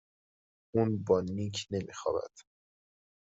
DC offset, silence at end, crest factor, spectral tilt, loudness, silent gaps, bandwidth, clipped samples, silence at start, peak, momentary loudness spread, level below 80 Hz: under 0.1%; 0.95 s; 20 dB; -6 dB/octave; -33 LUFS; none; 8 kHz; under 0.1%; 0.75 s; -14 dBFS; 8 LU; -68 dBFS